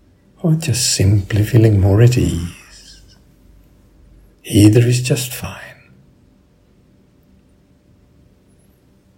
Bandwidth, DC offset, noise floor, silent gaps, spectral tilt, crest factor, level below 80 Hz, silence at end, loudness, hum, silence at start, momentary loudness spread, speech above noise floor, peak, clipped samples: 16.5 kHz; under 0.1%; -52 dBFS; none; -5.5 dB/octave; 18 dB; -42 dBFS; 3.45 s; -14 LUFS; none; 0.45 s; 20 LU; 39 dB; 0 dBFS; under 0.1%